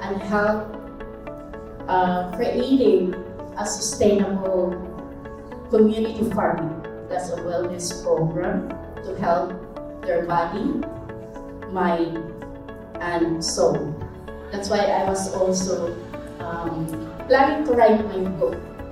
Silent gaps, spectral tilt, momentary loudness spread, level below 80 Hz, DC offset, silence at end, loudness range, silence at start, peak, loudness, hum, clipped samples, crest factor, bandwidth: none; -5 dB/octave; 18 LU; -44 dBFS; under 0.1%; 0 s; 4 LU; 0 s; -4 dBFS; -23 LUFS; none; under 0.1%; 20 dB; 15.5 kHz